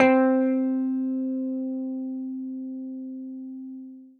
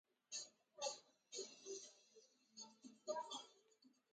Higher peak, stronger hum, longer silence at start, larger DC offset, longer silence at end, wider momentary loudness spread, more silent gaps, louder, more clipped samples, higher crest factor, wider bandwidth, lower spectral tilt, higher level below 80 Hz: first, -4 dBFS vs -32 dBFS; neither; second, 0 s vs 0.3 s; neither; second, 0.1 s vs 0.25 s; first, 16 LU vs 13 LU; neither; first, -27 LUFS vs -52 LUFS; neither; about the same, 22 dB vs 22 dB; second, 4.5 kHz vs 9.6 kHz; first, -7 dB/octave vs 0 dB/octave; first, -68 dBFS vs under -90 dBFS